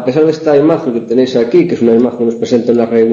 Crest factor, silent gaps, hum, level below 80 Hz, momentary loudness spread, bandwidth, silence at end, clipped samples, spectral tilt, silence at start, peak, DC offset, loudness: 10 dB; none; none; -52 dBFS; 4 LU; 7.4 kHz; 0 s; under 0.1%; -7.5 dB/octave; 0 s; 0 dBFS; under 0.1%; -11 LUFS